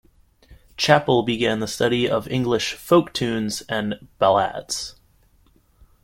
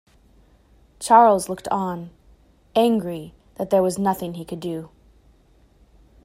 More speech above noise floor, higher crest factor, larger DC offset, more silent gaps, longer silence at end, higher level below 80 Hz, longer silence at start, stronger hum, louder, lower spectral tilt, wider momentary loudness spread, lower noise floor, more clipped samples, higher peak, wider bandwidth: about the same, 37 dB vs 36 dB; about the same, 22 dB vs 22 dB; neither; neither; second, 1.1 s vs 1.4 s; about the same, -52 dBFS vs -56 dBFS; second, 0.5 s vs 1 s; neither; about the same, -21 LUFS vs -21 LUFS; about the same, -4.5 dB/octave vs -5.5 dB/octave; second, 10 LU vs 20 LU; about the same, -58 dBFS vs -56 dBFS; neither; about the same, -2 dBFS vs -2 dBFS; about the same, 16.5 kHz vs 16 kHz